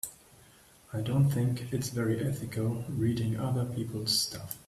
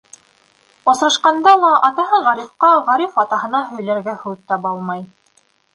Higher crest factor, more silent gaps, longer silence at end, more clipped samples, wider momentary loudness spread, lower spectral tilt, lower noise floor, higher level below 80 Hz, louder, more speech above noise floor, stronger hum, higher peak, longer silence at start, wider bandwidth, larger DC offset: about the same, 16 dB vs 16 dB; neither; second, 0.05 s vs 0.7 s; neither; second, 7 LU vs 13 LU; first, -5.5 dB/octave vs -3.5 dB/octave; about the same, -58 dBFS vs -58 dBFS; first, -58 dBFS vs -68 dBFS; second, -31 LUFS vs -15 LUFS; second, 28 dB vs 43 dB; neither; second, -16 dBFS vs 0 dBFS; second, 0.05 s vs 0.85 s; first, 15.5 kHz vs 11.5 kHz; neither